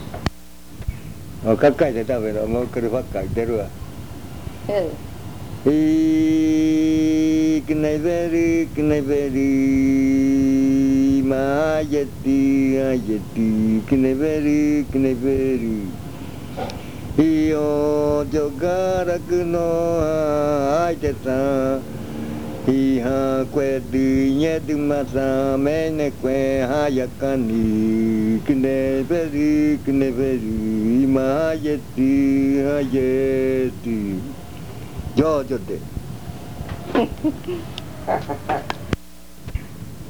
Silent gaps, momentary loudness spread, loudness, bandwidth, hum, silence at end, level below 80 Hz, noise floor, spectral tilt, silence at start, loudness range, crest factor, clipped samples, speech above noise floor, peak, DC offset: none; 15 LU; -20 LUFS; over 20 kHz; none; 0 s; -40 dBFS; -43 dBFS; -7 dB/octave; 0 s; 7 LU; 18 dB; under 0.1%; 24 dB; -2 dBFS; 1%